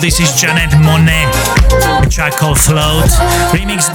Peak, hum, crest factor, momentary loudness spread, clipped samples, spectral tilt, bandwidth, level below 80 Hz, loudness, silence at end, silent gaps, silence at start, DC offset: 0 dBFS; none; 10 dB; 3 LU; under 0.1%; -4 dB/octave; 19.5 kHz; -16 dBFS; -10 LUFS; 0 s; none; 0 s; under 0.1%